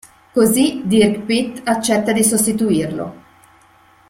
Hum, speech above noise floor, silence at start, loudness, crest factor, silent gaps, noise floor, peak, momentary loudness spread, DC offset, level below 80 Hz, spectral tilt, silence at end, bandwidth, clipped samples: none; 35 dB; 0.35 s; -16 LUFS; 16 dB; none; -50 dBFS; -2 dBFS; 9 LU; under 0.1%; -52 dBFS; -4 dB/octave; 0.9 s; 16.5 kHz; under 0.1%